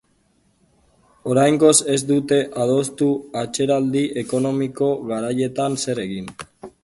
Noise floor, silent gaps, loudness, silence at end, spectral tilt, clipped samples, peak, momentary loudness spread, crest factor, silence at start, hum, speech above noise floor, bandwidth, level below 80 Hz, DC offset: -62 dBFS; none; -20 LUFS; 0.15 s; -4.5 dB/octave; under 0.1%; -2 dBFS; 13 LU; 18 dB; 1.25 s; none; 43 dB; 12 kHz; -58 dBFS; under 0.1%